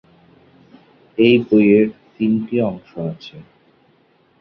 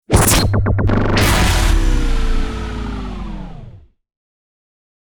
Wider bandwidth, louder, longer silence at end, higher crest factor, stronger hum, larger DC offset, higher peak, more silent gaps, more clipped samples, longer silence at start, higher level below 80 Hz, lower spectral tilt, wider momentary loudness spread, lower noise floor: second, 5.8 kHz vs over 20 kHz; about the same, -17 LUFS vs -16 LUFS; second, 1 s vs 1.3 s; about the same, 18 dB vs 14 dB; neither; neither; about the same, -2 dBFS vs -2 dBFS; neither; neither; first, 1.2 s vs 0.1 s; second, -58 dBFS vs -20 dBFS; first, -9 dB/octave vs -4.5 dB/octave; about the same, 17 LU vs 17 LU; first, -57 dBFS vs -39 dBFS